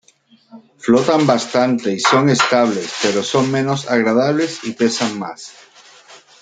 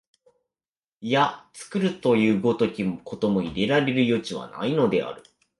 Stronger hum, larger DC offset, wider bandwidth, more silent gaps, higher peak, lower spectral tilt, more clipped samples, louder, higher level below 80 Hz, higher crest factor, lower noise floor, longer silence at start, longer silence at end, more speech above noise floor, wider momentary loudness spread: neither; neither; second, 9.4 kHz vs 11.5 kHz; neither; first, 0 dBFS vs -6 dBFS; second, -4.5 dB/octave vs -6.5 dB/octave; neither; first, -16 LUFS vs -24 LUFS; about the same, -62 dBFS vs -58 dBFS; about the same, 16 dB vs 18 dB; second, -53 dBFS vs under -90 dBFS; second, 0.55 s vs 1 s; second, 0.25 s vs 0.4 s; second, 37 dB vs over 67 dB; second, 9 LU vs 12 LU